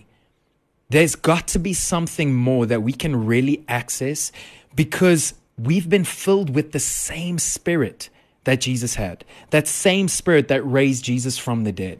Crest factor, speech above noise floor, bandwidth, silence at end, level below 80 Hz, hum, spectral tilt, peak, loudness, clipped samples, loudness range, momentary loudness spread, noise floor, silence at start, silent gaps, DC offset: 16 dB; 46 dB; 14 kHz; 0.05 s; -44 dBFS; none; -4.5 dB/octave; -4 dBFS; -20 LUFS; under 0.1%; 2 LU; 9 LU; -66 dBFS; 0.9 s; none; under 0.1%